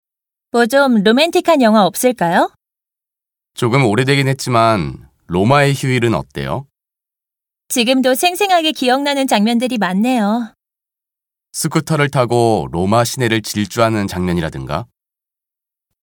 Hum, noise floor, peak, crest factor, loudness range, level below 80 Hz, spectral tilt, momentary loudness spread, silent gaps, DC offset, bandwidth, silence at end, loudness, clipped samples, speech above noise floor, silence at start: none; -87 dBFS; 0 dBFS; 16 dB; 3 LU; -46 dBFS; -5 dB/octave; 10 LU; none; under 0.1%; 19 kHz; 1.2 s; -15 LUFS; under 0.1%; 73 dB; 0.55 s